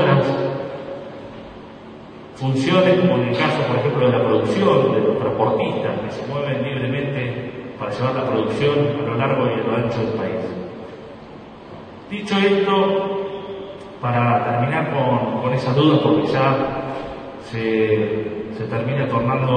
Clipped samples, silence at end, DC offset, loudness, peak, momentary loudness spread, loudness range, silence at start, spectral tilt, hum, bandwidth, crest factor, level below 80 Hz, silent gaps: under 0.1%; 0 s; under 0.1%; -20 LUFS; -2 dBFS; 19 LU; 5 LU; 0 s; -7.5 dB/octave; none; 9.4 kHz; 18 dB; -52 dBFS; none